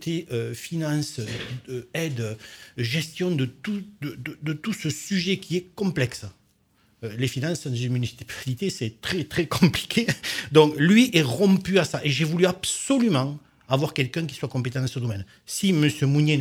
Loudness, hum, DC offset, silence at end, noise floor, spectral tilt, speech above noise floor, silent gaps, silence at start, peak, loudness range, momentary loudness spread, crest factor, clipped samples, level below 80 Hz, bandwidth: -24 LUFS; none; under 0.1%; 0 s; -63 dBFS; -5.5 dB/octave; 39 dB; none; 0 s; -2 dBFS; 9 LU; 13 LU; 22 dB; under 0.1%; -56 dBFS; 17.5 kHz